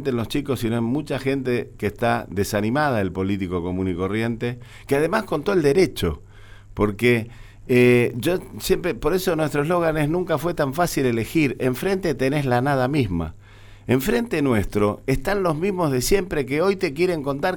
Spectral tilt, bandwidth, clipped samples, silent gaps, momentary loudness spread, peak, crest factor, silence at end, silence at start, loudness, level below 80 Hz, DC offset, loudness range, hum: -6 dB/octave; over 20 kHz; under 0.1%; none; 6 LU; -6 dBFS; 16 dB; 0 s; 0 s; -22 LUFS; -40 dBFS; under 0.1%; 3 LU; none